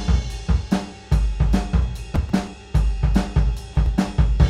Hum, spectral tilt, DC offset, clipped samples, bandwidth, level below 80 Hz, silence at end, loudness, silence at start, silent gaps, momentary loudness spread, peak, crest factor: none; -7 dB/octave; under 0.1%; under 0.1%; 11 kHz; -22 dBFS; 0 s; -23 LUFS; 0 s; none; 5 LU; -4 dBFS; 14 dB